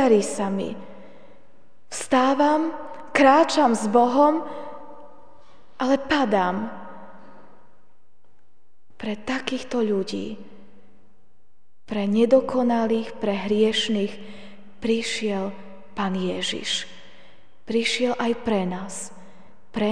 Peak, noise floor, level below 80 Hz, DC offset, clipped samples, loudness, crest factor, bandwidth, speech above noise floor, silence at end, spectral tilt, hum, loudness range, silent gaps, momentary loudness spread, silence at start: -4 dBFS; -69 dBFS; -60 dBFS; 1%; under 0.1%; -23 LUFS; 20 dB; 10 kHz; 47 dB; 0 s; -4.5 dB/octave; none; 10 LU; none; 19 LU; 0 s